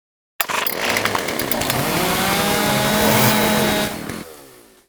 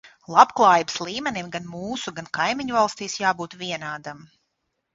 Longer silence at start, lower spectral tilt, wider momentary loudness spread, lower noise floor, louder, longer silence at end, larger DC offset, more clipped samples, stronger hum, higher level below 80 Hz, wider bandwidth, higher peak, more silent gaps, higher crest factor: first, 0.4 s vs 0.05 s; about the same, -3.5 dB/octave vs -3.5 dB/octave; second, 10 LU vs 15 LU; second, -45 dBFS vs -76 dBFS; first, -18 LUFS vs -22 LUFS; second, 0.4 s vs 0.75 s; neither; neither; neither; first, -44 dBFS vs -62 dBFS; first, over 20 kHz vs 8 kHz; about the same, 0 dBFS vs 0 dBFS; neither; about the same, 20 dB vs 24 dB